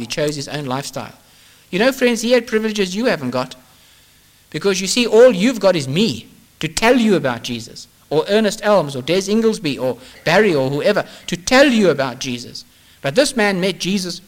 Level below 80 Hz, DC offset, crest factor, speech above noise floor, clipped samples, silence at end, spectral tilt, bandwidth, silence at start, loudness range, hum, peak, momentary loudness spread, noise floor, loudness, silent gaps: -48 dBFS; under 0.1%; 16 dB; 34 dB; under 0.1%; 0.1 s; -4.5 dB/octave; 17 kHz; 0 s; 4 LU; none; -2 dBFS; 14 LU; -51 dBFS; -17 LUFS; none